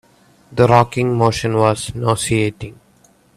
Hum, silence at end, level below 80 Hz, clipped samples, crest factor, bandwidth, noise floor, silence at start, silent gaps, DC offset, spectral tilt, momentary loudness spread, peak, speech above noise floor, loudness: none; 0.65 s; -44 dBFS; under 0.1%; 18 dB; 14 kHz; -53 dBFS; 0.5 s; none; under 0.1%; -5.5 dB/octave; 13 LU; 0 dBFS; 37 dB; -16 LUFS